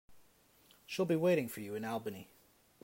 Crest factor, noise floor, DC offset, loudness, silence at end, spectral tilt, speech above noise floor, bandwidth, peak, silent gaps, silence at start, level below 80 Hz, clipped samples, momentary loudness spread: 16 dB; -67 dBFS; under 0.1%; -36 LUFS; 0.6 s; -6 dB/octave; 32 dB; 16 kHz; -22 dBFS; none; 0.1 s; -78 dBFS; under 0.1%; 14 LU